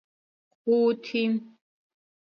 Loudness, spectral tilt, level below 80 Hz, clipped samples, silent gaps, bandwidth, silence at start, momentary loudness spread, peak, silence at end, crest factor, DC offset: -26 LUFS; -7 dB/octave; -82 dBFS; under 0.1%; none; 6.6 kHz; 0.65 s; 9 LU; -12 dBFS; 0.75 s; 16 dB; under 0.1%